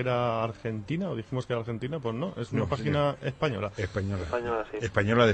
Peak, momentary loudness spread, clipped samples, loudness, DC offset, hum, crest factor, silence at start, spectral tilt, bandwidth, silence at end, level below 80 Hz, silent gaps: -10 dBFS; 6 LU; under 0.1%; -30 LUFS; under 0.1%; none; 20 dB; 0 s; -7 dB/octave; 8.8 kHz; 0 s; -52 dBFS; none